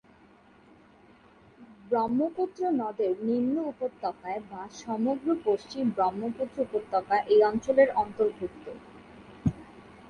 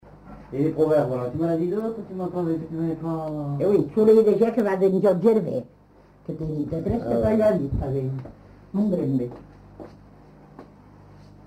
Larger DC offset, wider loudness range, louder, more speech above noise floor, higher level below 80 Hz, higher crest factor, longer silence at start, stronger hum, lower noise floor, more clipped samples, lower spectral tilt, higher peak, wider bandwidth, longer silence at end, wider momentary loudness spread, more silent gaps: neither; second, 4 LU vs 8 LU; second, -28 LUFS vs -23 LUFS; about the same, 30 dB vs 31 dB; second, -58 dBFS vs -46 dBFS; first, 22 dB vs 16 dB; first, 1.6 s vs 0.15 s; second, none vs 50 Hz at -50 dBFS; first, -57 dBFS vs -53 dBFS; neither; second, -7 dB/octave vs -9.5 dB/octave; about the same, -8 dBFS vs -8 dBFS; second, 9.4 kHz vs 13 kHz; second, 0 s vs 0.8 s; about the same, 15 LU vs 14 LU; neither